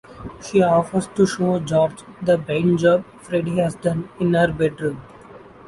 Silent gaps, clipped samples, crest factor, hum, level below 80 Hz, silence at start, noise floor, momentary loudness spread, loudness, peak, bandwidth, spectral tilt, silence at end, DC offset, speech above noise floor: none; under 0.1%; 16 dB; none; -50 dBFS; 0.1 s; -43 dBFS; 10 LU; -20 LUFS; -4 dBFS; 11.5 kHz; -6.5 dB/octave; 0.3 s; under 0.1%; 23 dB